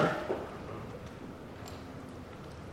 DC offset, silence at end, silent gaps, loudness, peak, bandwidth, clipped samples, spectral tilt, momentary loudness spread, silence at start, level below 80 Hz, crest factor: under 0.1%; 0 s; none; -41 LUFS; -16 dBFS; 16 kHz; under 0.1%; -6 dB/octave; 10 LU; 0 s; -56 dBFS; 22 dB